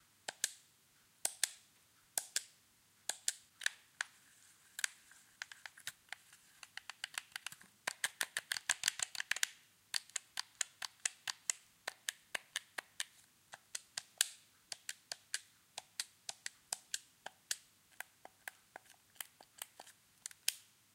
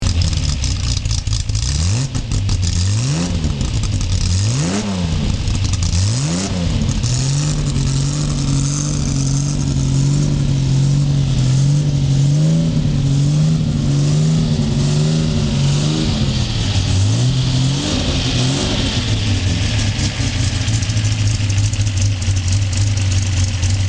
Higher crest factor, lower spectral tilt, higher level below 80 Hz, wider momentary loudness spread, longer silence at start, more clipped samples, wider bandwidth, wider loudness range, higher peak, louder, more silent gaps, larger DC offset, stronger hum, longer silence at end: first, 36 dB vs 14 dB; second, 3 dB/octave vs -5 dB/octave; second, under -90 dBFS vs -26 dBFS; first, 18 LU vs 4 LU; first, 0.3 s vs 0 s; neither; first, 16.5 kHz vs 10 kHz; first, 8 LU vs 3 LU; second, -12 dBFS vs -2 dBFS; second, -43 LUFS vs -17 LUFS; neither; second, under 0.1% vs 0.3%; neither; first, 0.35 s vs 0 s